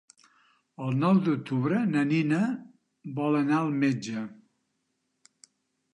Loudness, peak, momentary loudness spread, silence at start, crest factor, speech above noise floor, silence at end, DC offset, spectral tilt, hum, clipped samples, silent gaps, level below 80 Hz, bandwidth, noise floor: -27 LUFS; -12 dBFS; 14 LU; 0.8 s; 16 dB; 52 dB; 1.6 s; under 0.1%; -7.5 dB/octave; none; under 0.1%; none; -76 dBFS; 10.5 kHz; -78 dBFS